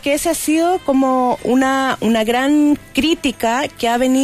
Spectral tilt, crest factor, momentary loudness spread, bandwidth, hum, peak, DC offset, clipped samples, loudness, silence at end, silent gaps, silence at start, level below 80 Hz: -3.5 dB/octave; 10 dB; 3 LU; 15.5 kHz; none; -4 dBFS; under 0.1%; under 0.1%; -16 LUFS; 0 s; none; 0.05 s; -44 dBFS